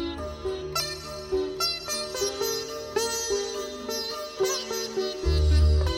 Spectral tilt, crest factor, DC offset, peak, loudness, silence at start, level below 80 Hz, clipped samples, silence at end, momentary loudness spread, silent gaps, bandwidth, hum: -4 dB/octave; 16 dB; under 0.1%; -12 dBFS; -28 LUFS; 0 s; -30 dBFS; under 0.1%; 0 s; 10 LU; none; 16 kHz; none